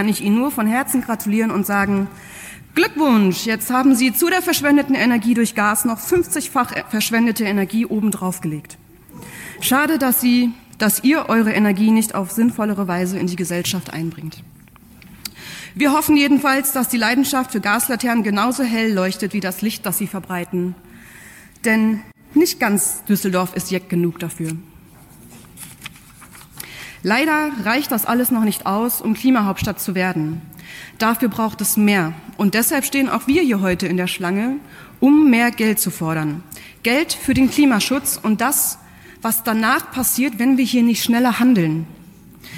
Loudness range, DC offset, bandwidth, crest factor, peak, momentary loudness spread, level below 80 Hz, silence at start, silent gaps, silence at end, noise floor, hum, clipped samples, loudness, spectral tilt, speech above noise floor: 6 LU; under 0.1%; 17 kHz; 14 dB; -6 dBFS; 12 LU; -50 dBFS; 0 s; none; 0 s; -45 dBFS; none; under 0.1%; -18 LUFS; -4 dB/octave; 27 dB